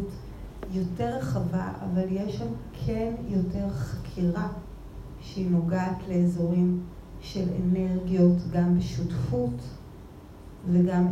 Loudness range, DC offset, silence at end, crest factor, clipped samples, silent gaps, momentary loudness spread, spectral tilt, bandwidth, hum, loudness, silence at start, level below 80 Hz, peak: 5 LU; under 0.1%; 0 s; 18 dB; under 0.1%; none; 19 LU; -8.5 dB/octave; 8 kHz; none; -28 LUFS; 0 s; -44 dBFS; -10 dBFS